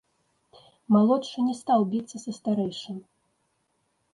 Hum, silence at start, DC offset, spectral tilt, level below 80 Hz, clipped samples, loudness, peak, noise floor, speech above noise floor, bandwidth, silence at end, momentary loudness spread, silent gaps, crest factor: none; 0.9 s; under 0.1%; -7 dB/octave; -72 dBFS; under 0.1%; -25 LUFS; -10 dBFS; -73 dBFS; 48 dB; 11 kHz; 1.15 s; 16 LU; none; 18 dB